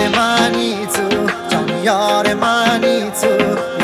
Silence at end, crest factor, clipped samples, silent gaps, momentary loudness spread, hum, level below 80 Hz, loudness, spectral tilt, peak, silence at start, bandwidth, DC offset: 0 s; 14 dB; under 0.1%; none; 4 LU; none; -50 dBFS; -15 LUFS; -3.5 dB/octave; 0 dBFS; 0 s; 16 kHz; under 0.1%